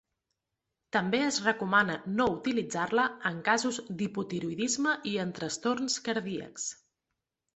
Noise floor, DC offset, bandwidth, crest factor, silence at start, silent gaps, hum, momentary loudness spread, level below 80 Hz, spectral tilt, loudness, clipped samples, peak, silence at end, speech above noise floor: -86 dBFS; under 0.1%; 8.4 kHz; 20 dB; 0.95 s; none; none; 8 LU; -66 dBFS; -3.5 dB/octave; -30 LUFS; under 0.1%; -10 dBFS; 0.8 s; 56 dB